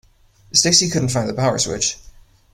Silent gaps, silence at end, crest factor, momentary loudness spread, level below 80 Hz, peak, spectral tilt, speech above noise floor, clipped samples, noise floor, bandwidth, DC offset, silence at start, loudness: none; 0.45 s; 20 dB; 9 LU; -46 dBFS; 0 dBFS; -3 dB/octave; 34 dB; under 0.1%; -52 dBFS; 16 kHz; under 0.1%; 0.55 s; -17 LUFS